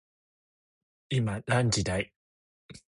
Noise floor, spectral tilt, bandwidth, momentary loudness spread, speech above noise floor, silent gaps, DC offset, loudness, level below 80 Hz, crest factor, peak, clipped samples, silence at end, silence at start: under -90 dBFS; -5 dB/octave; 11.5 kHz; 7 LU; over 62 dB; 2.16-2.69 s; under 0.1%; -29 LUFS; -52 dBFS; 20 dB; -12 dBFS; under 0.1%; 0.2 s; 1.1 s